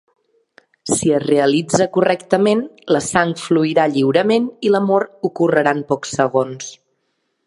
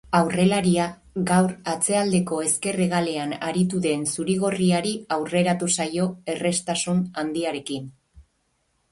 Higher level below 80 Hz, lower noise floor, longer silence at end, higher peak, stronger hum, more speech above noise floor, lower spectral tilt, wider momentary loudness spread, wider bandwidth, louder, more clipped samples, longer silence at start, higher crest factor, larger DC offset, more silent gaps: about the same, -58 dBFS vs -58 dBFS; about the same, -69 dBFS vs -70 dBFS; about the same, 0.7 s vs 0.7 s; first, 0 dBFS vs -4 dBFS; neither; first, 53 dB vs 47 dB; about the same, -5 dB/octave vs -4.5 dB/octave; about the same, 6 LU vs 7 LU; about the same, 11.5 kHz vs 11.5 kHz; first, -17 LUFS vs -23 LUFS; neither; first, 0.85 s vs 0.05 s; about the same, 18 dB vs 20 dB; neither; neither